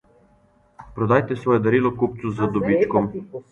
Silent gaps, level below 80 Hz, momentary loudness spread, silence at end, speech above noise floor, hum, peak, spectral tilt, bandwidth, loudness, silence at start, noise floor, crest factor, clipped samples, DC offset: none; -52 dBFS; 9 LU; 0.1 s; 38 dB; none; -4 dBFS; -9 dB/octave; 7.8 kHz; -21 LUFS; 0.8 s; -58 dBFS; 18 dB; under 0.1%; under 0.1%